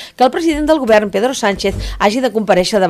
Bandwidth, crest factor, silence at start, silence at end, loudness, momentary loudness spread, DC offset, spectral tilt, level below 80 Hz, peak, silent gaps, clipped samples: 15 kHz; 12 dB; 0 s; 0 s; -14 LUFS; 5 LU; under 0.1%; -4.5 dB/octave; -32 dBFS; 0 dBFS; none; under 0.1%